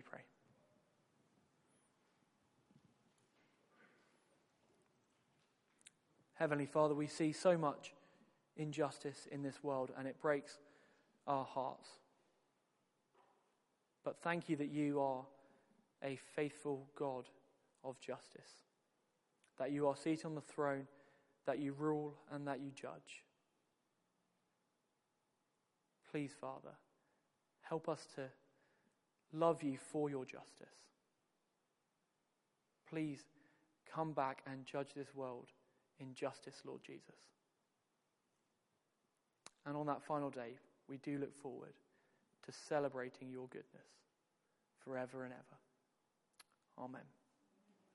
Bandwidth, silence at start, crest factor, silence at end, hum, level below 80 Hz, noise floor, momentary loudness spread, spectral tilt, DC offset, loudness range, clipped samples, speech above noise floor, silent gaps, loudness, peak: 11.5 kHz; 0.05 s; 26 dB; 0.85 s; none; under -90 dBFS; -86 dBFS; 20 LU; -6 dB/octave; under 0.1%; 13 LU; under 0.1%; 42 dB; none; -44 LUFS; -22 dBFS